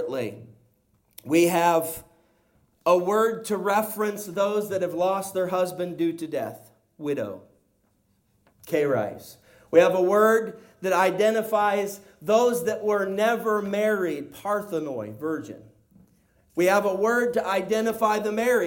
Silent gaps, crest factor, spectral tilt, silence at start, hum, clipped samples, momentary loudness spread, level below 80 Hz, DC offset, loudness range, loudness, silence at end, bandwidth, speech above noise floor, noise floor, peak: none; 20 dB; -5 dB/octave; 0 s; none; under 0.1%; 13 LU; -68 dBFS; under 0.1%; 7 LU; -24 LUFS; 0 s; 17 kHz; 44 dB; -67 dBFS; -4 dBFS